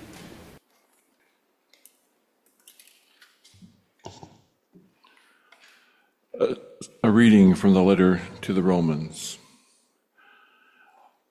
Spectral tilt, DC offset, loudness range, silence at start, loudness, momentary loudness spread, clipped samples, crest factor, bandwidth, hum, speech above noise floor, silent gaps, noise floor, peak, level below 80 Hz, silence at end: -7 dB/octave; under 0.1%; 15 LU; 4.05 s; -21 LUFS; 28 LU; under 0.1%; 20 dB; 13 kHz; none; 50 dB; none; -69 dBFS; -6 dBFS; -54 dBFS; 1.95 s